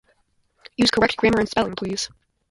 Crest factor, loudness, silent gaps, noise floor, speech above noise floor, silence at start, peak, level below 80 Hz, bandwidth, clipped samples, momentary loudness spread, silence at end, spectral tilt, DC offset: 18 dB; -21 LUFS; none; -65 dBFS; 45 dB; 0.8 s; -4 dBFS; -48 dBFS; 11.5 kHz; under 0.1%; 11 LU; 0.45 s; -4 dB/octave; under 0.1%